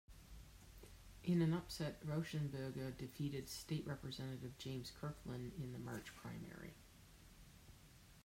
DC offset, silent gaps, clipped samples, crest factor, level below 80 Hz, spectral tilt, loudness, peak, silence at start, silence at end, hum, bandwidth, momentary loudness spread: under 0.1%; none; under 0.1%; 18 dB; -64 dBFS; -6 dB/octave; -46 LUFS; -28 dBFS; 0.1 s; 0 s; none; 16 kHz; 22 LU